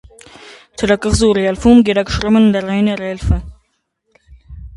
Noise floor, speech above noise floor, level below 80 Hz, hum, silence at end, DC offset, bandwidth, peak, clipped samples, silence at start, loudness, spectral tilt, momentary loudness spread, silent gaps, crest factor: -66 dBFS; 53 dB; -28 dBFS; none; 0 s; under 0.1%; 11.5 kHz; 0 dBFS; under 0.1%; 0.45 s; -14 LUFS; -6 dB/octave; 10 LU; none; 14 dB